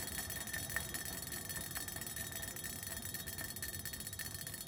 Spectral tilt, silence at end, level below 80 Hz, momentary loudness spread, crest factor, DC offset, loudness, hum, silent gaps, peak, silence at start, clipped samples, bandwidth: -2 dB/octave; 0 s; -60 dBFS; 3 LU; 24 dB; under 0.1%; -42 LUFS; none; none; -20 dBFS; 0 s; under 0.1%; 18 kHz